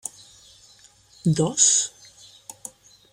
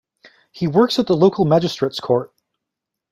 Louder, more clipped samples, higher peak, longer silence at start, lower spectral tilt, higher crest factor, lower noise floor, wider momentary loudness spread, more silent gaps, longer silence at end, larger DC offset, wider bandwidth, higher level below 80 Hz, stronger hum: about the same, -20 LUFS vs -18 LUFS; neither; about the same, -4 dBFS vs -2 dBFS; second, 0.05 s vs 0.55 s; second, -3.5 dB/octave vs -7 dB/octave; about the same, 22 dB vs 18 dB; second, -54 dBFS vs -82 dBFS; first, 25 LU vs 8 LU; neither; first, 1.25 s vs 0.85 s; neither; first, 16 kHz vs 14.5 kHz; about the same, -62 dBFS vs -58 dBFS; neither